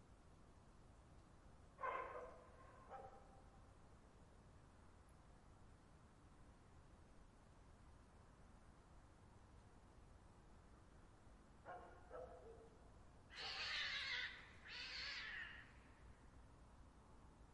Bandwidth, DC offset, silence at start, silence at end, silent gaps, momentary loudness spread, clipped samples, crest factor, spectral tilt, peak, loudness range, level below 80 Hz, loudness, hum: 11 kHz; under 0.1%; 0 s; 0 s; none; 21 LU; under 0.1%; 24 dB; -3 dB/octave; -34 dBFS; 20 LU; -70 dBFS; -51 LUFS; none